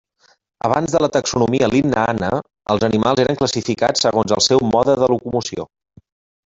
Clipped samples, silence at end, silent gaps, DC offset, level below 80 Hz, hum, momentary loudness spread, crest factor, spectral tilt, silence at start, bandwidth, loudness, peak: under 0.1%; 0.85 s; none; under 0.1%; -48 dBFS; none; 8 LU; 16 dB; -4.5 dB/octave; 0.65 s; 8 kHz; -17 LUFS; -2 dBFS